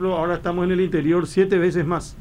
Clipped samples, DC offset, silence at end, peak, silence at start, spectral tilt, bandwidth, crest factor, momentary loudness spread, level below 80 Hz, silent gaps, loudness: under 0.1%; under 0.1%; 0 s; -6 dBFS; 0 s; -7 dB/octave; 11 kHz; 14 dB; 5 LU; -42 dBFS; none; -21 LUFS